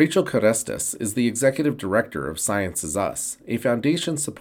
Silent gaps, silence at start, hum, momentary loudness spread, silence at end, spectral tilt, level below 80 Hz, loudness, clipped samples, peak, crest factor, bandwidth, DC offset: none; 0 s; none; 6 LU; 0 s; -4 dB/octave; -56 dBFS; -23 LUFS; under 0.1%; -4 dBFS; 18 dB; 18 kHz; under 0.1%